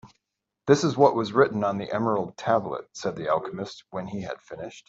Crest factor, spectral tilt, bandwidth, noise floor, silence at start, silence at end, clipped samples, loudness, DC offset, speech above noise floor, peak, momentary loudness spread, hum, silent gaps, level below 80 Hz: 22 dB; -6 dB/octave; 7.8 kHz; -84 dBFS; 0.05 s; 0.1 s; under 0.1%; -25 LUFS; under 0.1%; 59 dB; -4 dBFS; 15 LU; none; none; -64 dBFS